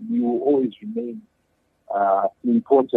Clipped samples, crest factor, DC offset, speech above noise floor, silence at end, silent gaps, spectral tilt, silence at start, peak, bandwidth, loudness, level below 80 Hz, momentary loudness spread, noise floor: under 0.1%; 18 dB; under 0.1%; 47 dB; 0 s; none; -9.5 dB/octave; 0 s; -4 dBFS; 3.9 kHz; -22 LUFS; -72 dBFS; 12 LU; -68 dBFS